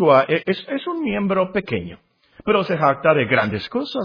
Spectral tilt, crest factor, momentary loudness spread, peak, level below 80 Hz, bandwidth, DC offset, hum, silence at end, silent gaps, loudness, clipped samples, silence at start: -8 dB/octave; 18 dB; 10 LU; -2 dBFS; -54 dBFS; 5.2 kHz; under 0.1%; none; 0 s; none; -20 LUFS; under 0.1%; 0 s